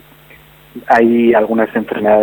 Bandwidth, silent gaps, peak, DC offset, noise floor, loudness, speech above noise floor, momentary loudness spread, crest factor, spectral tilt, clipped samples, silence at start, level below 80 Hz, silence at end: 19 kHz; none; 0 dBFS; under 0.1%; -42 dBFS; -12 LUFS; 31 dB; 7 LU; 12 dB; -7.5 dB/octave; under 0.1%; 0.75 s; -52 dBFS; 0 s